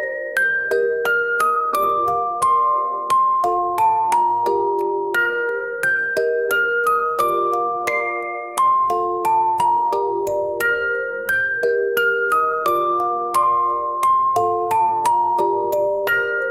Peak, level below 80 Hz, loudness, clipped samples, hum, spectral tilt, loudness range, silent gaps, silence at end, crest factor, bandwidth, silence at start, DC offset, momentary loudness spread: -4 dBFS; -60 dBFS; -19 LUFS; under 0.1%; none; -3.5 dB/octave; 1 LU; none; 0 s; 14 dB; 17 kHz; 0 s; 0.1%; 4 LU